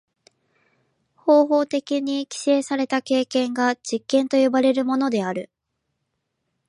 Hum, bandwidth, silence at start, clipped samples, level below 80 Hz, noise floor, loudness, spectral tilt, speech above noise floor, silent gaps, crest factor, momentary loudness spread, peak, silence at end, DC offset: none; 11.5 kHz; 1.25 s; under 0.1%; -76 dBFS; -77 dBFS; -21 LUFS; -4 dB/octave; 56 dB; none; 18 dB; 9 LU; -4 dBFS; 1.25 s; under 0.1%